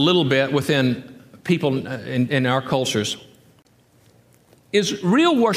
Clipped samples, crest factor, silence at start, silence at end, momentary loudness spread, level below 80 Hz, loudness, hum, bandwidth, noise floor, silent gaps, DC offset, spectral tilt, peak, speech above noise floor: under 0.1%; 16 dB; 0 s; 0 s; 10 LU; -62 dBFS; -20 LUFS; none; 15.5 kHz; -56 dBFS; none; under 0.1%; -5 dB/octave; -4 dBFS; 37 dB